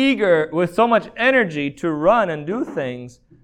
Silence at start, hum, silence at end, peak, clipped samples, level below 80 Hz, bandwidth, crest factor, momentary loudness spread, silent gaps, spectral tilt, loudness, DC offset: 0 s; none; 0.35 s; -4 dBFS; under 0.1%; -54 dBFS; 11 kHz; 16 dB; 9 LU; none; -6 dB/octave; -19 LUFS; under 0.1%